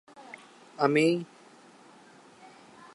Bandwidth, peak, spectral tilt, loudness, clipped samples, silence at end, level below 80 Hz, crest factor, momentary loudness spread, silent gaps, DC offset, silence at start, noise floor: 11.5 kHz; -10 dBFS; -6 dB/octave; -26 LUFS; under 0.1%; 1.7 s; -86 dBFS; 22 dB; 24 LU; none; under 0.1%; 0.2 s; -55 dBFS